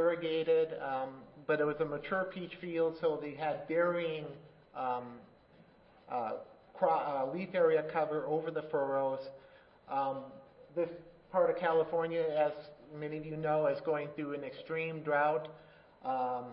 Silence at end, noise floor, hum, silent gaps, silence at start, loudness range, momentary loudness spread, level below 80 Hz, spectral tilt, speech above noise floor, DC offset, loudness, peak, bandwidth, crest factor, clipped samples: 0 s; -62 dBFS; none; none; 0 s; 4 LU; 13 LU; -72 dBFS; -9.5 dB/octave; 28 dB; under 0.1%; -35 LUFS; -16 dBFS; 5.4 kHz; 20 dB; under 0.1%